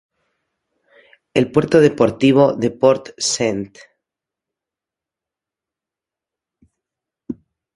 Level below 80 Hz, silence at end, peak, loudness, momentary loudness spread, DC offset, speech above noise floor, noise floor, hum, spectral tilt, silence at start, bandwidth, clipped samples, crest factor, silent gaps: -56 dBFS; 0.45 s; 0 dBFS; -16 LUFS; 20 LU; under 0.1%; 72 dB; -87 dBFS; none; -5 dB/octave; 1.35 s; 11.5 kHz; under 0.1%; 20 dB; none